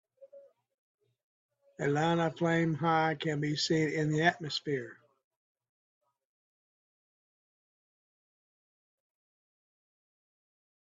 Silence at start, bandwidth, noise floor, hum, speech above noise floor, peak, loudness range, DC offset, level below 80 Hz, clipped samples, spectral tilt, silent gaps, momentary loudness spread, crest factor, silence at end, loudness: 0.2 s; 7.8 kHz; -58 dBFS; none; 28 dB; -10 dBFS; 9 LU; under 0.1%; -74 dBFS; under 0.1%; -5.5 dB/octave; 0.74-0.98 s, 1.24-1.49 s; 8 LU; 26 dB; 6 s; -30 LUFS